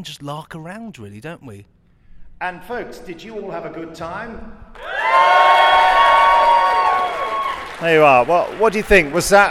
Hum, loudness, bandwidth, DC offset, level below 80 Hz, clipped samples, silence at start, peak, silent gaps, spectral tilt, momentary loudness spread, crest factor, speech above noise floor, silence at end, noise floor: none; -14 LUFS; 16 kHz; under 0.1%; -40 dBFS; under 0.1%; 0 s; 0 dBFS; none; -3.5 dB/octave; 22 LU; 16 dB; 21 dB; 0 s; -40 dBFS